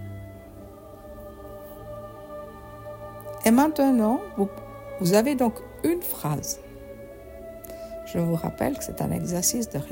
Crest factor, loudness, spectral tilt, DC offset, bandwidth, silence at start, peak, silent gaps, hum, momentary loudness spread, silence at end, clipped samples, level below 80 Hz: 22 dB; -25 LUFS; -5 dB/octave; under 0.1%; 16.5 kHz; 0 s; -4 dBFS; none; none; 22 LU; 0 s; under 0.1%; -50 dBFS